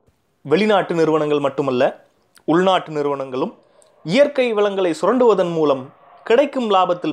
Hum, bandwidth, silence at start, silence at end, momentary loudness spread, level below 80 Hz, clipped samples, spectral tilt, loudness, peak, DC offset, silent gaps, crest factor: none; 10.5 kHz; 0.45 s; 0 s; 9 LU; -68 dBFS; under 0.1%; -6 dB/octave; -18 LUFS; -4 dBFS; under 0.1%; none; 16 dB